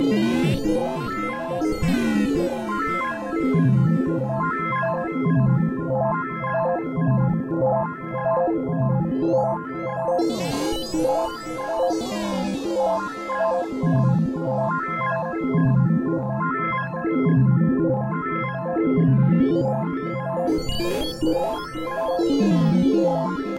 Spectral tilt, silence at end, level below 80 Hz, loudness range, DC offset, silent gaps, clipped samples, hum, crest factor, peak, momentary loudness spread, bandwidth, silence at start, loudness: -7.5 dB/octave; 0 s; -44 dBFS; 3 LU; under 0.1%; none; under 0.1%; none; 12 dB; -8 dBFS; 7 LU; 15 kHz; 0 s; -22 LUFS